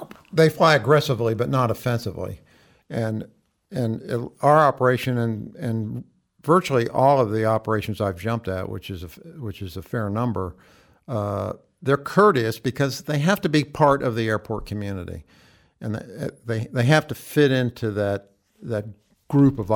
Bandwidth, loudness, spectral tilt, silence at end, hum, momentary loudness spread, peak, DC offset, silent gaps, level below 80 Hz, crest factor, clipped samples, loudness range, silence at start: 19.5 kHz; -22 LUFS; -6.5 dB/octave; 0 s; none; 16 LU; -4 dBFS; under 0.1%; none; -52 dBFS; 18 dB; under 0.1%; 6 LU; 0 s